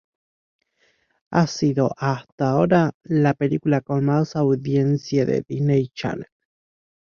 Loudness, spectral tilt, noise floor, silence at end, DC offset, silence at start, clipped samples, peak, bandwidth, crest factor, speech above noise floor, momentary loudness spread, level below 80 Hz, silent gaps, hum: -21 LUFS; -7.5 dB/octave; -65 dBFS; 0.95 s; under 0.1%; 1.3 s; under 0.1%; -2 dBFS; 7 kHz; 20 dB; 45 dB; 6 LU; -58 dBFS; 2.32-2.38 s, 2.94-3.00 s; none